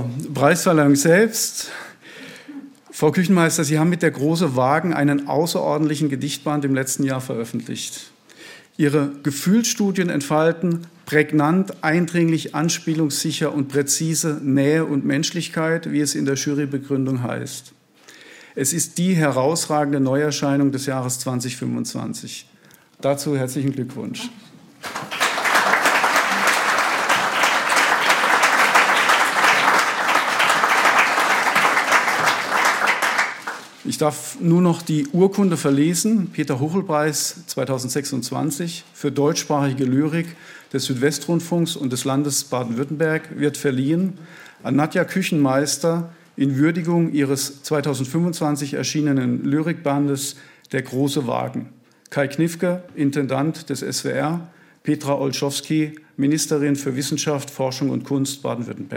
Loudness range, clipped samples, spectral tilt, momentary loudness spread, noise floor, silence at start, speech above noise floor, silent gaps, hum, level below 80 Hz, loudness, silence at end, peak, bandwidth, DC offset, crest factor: 8 LU; under 0.1%; -4.5 dB/octave; 12 LU; -48 dBFS; 0 s; 27 dB; none; none; -70 dBFS; -20 LUFS; 0 s; -2 dBFS; 17 kHz; under 0.1%; 18 dB